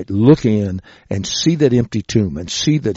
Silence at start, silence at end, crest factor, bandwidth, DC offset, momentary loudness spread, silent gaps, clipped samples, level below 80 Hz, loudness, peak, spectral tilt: 0 s; 0 s; 16 dB; 8 kHz; under 0.1%; 12 LU; none; under 0.1%; -42 dBFS; -16 LUFS; 0 dBFS; -6.5 dB/octave